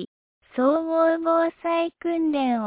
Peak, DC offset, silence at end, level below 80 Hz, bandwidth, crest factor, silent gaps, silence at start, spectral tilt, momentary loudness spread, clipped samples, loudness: -10 dBFS; under 0.1%; 0 s; -66 dBFS; 4 kHz; 14 dB; 0.07-0.41 s; 0 s; -9 dB/octave; 5 LU; under 0.1%; -23 LUFS